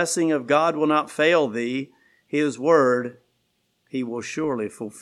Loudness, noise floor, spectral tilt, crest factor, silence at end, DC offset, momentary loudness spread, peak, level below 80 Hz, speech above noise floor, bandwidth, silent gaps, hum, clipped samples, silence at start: -22 LUFS; -70 dBFS; -4.5 dB/octave; 18 dB; 0 s; under 0.1%; 12 LU; -4 dBFS; -72 dBFS; 49 dB; 13.5 kHz; none; none; under 0.1%; 0 s